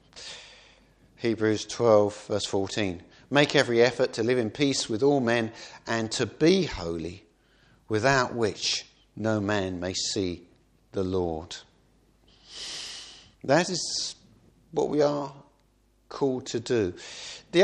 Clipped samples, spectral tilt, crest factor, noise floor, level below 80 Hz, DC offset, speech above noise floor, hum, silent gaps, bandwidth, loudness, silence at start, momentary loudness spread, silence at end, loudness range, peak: under 0.1%; -4.5 dB/octave; 22 dB; -65 dBFS; -58 dBFS; under 0.1%; 39 dB; none; none; 11 kHz; -26 LUFS; 0.15 s; 17 LU; 0 s; 7 LU; -4 dBFS